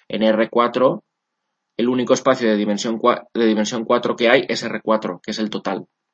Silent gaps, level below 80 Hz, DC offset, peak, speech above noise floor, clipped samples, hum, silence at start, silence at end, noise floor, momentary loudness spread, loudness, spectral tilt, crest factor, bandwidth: none; -68 dBFS; under 0.1%; 0 dBFS; 59 dB; under 0.1%; none; 0.1 s; 0.3 s; -77 dBFS; 9 LU; -19 LUFS; -4.5 dB/octave; 20 dB; 8.2 kHz